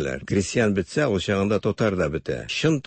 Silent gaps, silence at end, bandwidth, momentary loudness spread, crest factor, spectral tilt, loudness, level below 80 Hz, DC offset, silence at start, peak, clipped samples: none; 0.05 s; 8.8 kHz; 4 LU; 14 dB; -5.5 dB/octave; -23 LUFS; -46 dBFS; under 0.1%; 0 s; -8 dBFS; under 0.1%